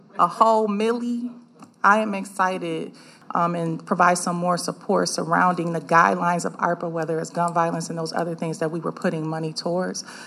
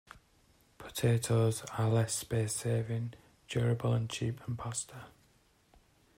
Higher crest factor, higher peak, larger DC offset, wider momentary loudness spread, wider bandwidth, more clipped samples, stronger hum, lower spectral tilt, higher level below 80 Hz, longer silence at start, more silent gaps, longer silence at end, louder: first, 22 dB vs 16 dB; first, -2 dBFS vs -18 dBFS; neither; second, 9 LU vs 12 LU; second, 14 kHz vs 16 kHz; neither; neither; about the same, -5 dB/octave vs -5.5 dB/octave; second, -82 dBFS vs -62 dBFS; second, 0.15 s vs 0.8 s; neither; second, 0 s vs 1.1 s; first, -23 LUFS vs -33 LUFS